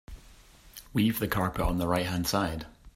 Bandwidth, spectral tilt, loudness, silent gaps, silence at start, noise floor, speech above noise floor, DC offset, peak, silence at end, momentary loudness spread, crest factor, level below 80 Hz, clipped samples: 16 kHz; -5.5 dB/octave; -29 LUFS; none; 0.1 s; -54 dBFS; 26 dB; under 0.1%; -12 dBFS; 0.05 s; 13 LU; 18 dB; -42 dBFS; under 0.1%